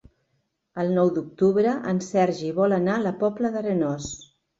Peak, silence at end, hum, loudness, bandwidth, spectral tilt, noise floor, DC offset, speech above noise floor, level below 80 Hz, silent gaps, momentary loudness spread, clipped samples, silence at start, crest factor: -8 dBFS; 0.35 s; none; -24 LUFS; 7.8 kHz; -6.5 dB/octave; -73 dBFS; under 0.1%; 50 dB; -58 dBFS; none; 9 LU; under 0.1%; 0.75 s; 16 dB